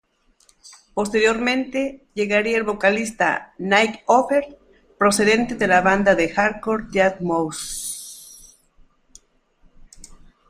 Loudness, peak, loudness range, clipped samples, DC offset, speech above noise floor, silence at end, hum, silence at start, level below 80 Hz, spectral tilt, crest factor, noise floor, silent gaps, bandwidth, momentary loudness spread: -20 LUFS; -2 dBFS; 7 LU; under 0.1%; under 0.1%; 39 dB; 0.35 s; none; 0.65 s; -50 dBFS; -4 dB/octave; 20 dB; -59 dBFS; none; 15 kHz; 11 LU